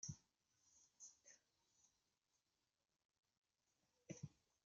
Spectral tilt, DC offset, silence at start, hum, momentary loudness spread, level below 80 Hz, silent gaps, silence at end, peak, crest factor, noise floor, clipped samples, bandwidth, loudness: -6.5 dB/octave; under 0.1%; 0 s; none; 11 LU; -88 dBFS; 3.05-3.09 s, 3.19-3.23 s, 3.37-3.42 s; 0.3 s; -38 dBFS; 26 dB; under -90 dBFS; under 0.1%; 7.6 kHz; -61 LUFS